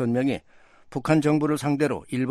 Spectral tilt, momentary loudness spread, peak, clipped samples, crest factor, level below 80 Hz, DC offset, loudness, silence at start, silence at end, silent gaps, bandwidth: -7 dB/octave; 11 LU; -8 dBFS; under 0.1%; 16 dB; -58 dBFS; under 0.1%; -24 LUFS; 0 s; 0 s; none; 13.5 kHz